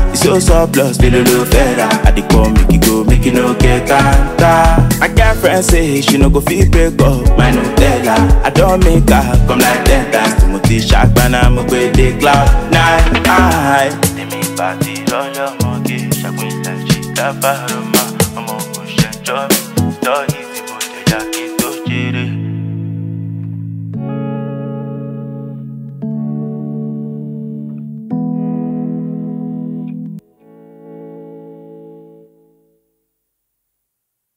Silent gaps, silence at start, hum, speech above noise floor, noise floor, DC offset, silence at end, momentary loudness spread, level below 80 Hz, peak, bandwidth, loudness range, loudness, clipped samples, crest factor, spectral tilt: none; 0 s; none; 65 dB; -74 dBFS; under 0.1%; 2.4 s; 14 LU; -18 dBFS; 0 dBFS; 16.5 kHz; 12 LU; -12 LUFS; 0.2%; 12 dB; -5 dB/octave